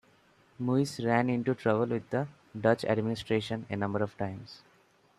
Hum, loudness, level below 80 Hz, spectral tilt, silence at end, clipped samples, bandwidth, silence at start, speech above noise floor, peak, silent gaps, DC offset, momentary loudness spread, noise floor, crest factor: none; -31 LUFS; -66 dBFS; -7 dB/octave; 0.6 s; under 0.1%; 13.5 kHz; 0.6 s; 35 dB; -12 dBFS; none; under 0.1%; 10 LU; -65 dBFS; 20 dB